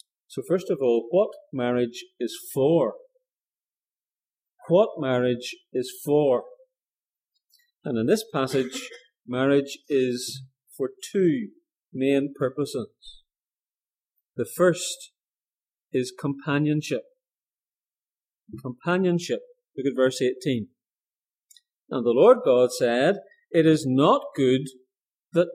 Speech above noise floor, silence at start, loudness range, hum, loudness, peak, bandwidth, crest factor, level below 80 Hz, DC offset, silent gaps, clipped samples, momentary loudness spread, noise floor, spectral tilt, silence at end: over 67 dB; 0.3 s; 8 LU; none; -24 LUFS; -4 dBFS; 15.5 kHz; 22 dB; -72 dBFS; under 0.1%; 4.13-4.17 s, 18.17-18.21 s, 21.28-21.32 s; under 0.1%; 14 LU; under -90 dBFS; -5.5 dB/octave; 0 s